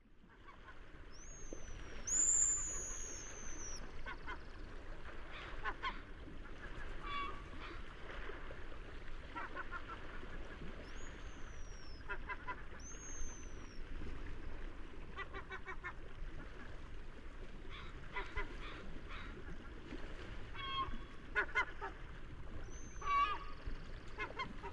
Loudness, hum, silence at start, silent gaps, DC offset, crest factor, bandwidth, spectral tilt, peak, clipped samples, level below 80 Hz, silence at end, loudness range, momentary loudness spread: -44 LUFS; none; 0 s; none; under 0.1%; 22 dB; 11 kHz; -2 dB/octave; -20 dBFS; under 0.1%; -50 dBFS; 0 s; 13 LU; 16 LU